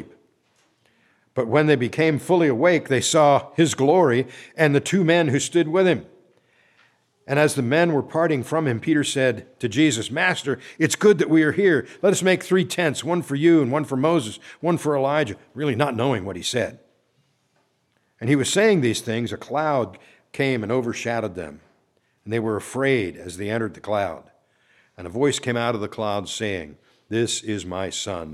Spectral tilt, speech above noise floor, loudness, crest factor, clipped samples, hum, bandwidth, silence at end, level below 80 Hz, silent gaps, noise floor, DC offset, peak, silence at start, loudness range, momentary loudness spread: -5 dB/octave; 47 dB; -21 LUFS; 20 dB; under 0.1%; none; 14.5 kHz; 0 s; -62 dBFS; none; -68 dBFS; under 0.1%; -2 dBFS; 0 s; 7 LU; 11 LU